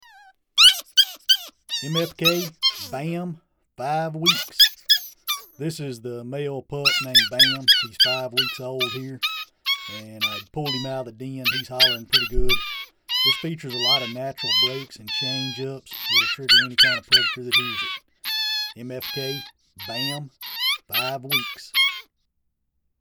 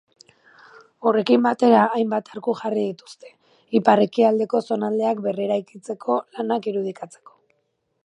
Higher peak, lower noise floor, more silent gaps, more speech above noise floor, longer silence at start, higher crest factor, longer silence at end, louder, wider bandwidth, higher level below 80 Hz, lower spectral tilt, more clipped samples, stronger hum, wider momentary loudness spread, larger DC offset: second, -4 dBFS vs 0 dBFS; about the same, -73 dBFS vs -72 dBFS; neither; about the same, 50 dB vs 51 dB; second, 0.55 s vs 1 s; about the same, 20 dB vs 22 dB; about the same, 1 s vs 1 s; about the same, -20 LUFS vs -21 LUFS; first, over 20 kHz vs 10.5 kHz; first, -42 dBFS vs -74 dBFS; second, -2 dB/octave vs -6.5 dB/octave; neither; neither; first, 16 LU vs 12 LU; neither